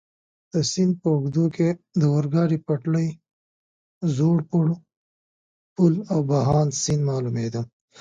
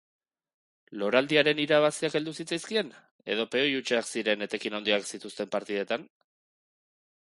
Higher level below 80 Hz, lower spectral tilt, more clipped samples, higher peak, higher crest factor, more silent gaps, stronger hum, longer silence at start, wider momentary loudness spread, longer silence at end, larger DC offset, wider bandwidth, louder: first, -54 dBFS vs -76 dBFS; first, -6.5 dB/octave vs -3.5 dB/octave; neither; about the same, -6 dBFS vs -6 dBFS; second, 16 dB vs 24 dB; first, 3.33-4.01 s, 4.97-5.76 s vs 3.11-3.19 s; neither; second, 0.55 s vs 0.9 s; second, 8 LU vs 11 LU; second, 0.35 s vs 1.2 s; neither; second, 9.2 kHz vs 11.5 kHz; first, -23 LUFS vs -28 LUFS